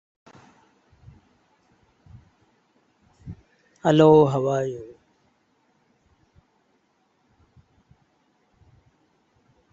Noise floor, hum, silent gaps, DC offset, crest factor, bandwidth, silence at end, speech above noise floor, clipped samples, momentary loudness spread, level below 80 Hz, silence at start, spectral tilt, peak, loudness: -67 dBFS; none; none; under 0.1%; 24 dB; 7.6 kHz; 4.9 s; 50 dB; under 0.1%; 31 LU; -62 dBFS; 3.25 s; -7.5 dB/octave; -4 dBFS; -19 LUFS